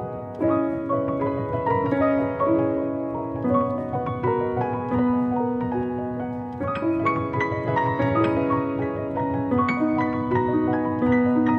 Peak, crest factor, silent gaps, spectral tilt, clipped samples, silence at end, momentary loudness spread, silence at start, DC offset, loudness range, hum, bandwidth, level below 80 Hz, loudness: -8 dBFS; 14 dB; none; -9.5 dB/octave; under 0.1%; 0 s; 6 LU; 0 s; under 0.1%; 2 LU; none; 6.2 kHz; -50 dBFS; -24 LUFS